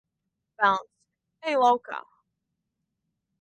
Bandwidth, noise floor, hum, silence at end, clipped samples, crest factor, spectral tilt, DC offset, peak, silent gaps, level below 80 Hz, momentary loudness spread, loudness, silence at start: 9 kHz; -83 dBFS; none; 1.4 s; under 0.1%; 22 dB; -4 dB/octave; under 0.1%; -8 dBFS; none; -74 dBFS; 15 LU; -25 LUFS; 0.6 s